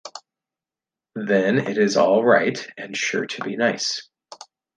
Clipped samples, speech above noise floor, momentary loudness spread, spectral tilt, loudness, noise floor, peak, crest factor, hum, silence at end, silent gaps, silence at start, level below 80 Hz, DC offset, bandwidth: under 0.1%; 69 dB; 15 LU; -4 dB/octave; -21 LUFS; -90 dBFS; -4 dBFS; 20 dB; none; 0.4 s; none; 0.05 s; -70 dBFS; under 0.1%; 9.8 kHz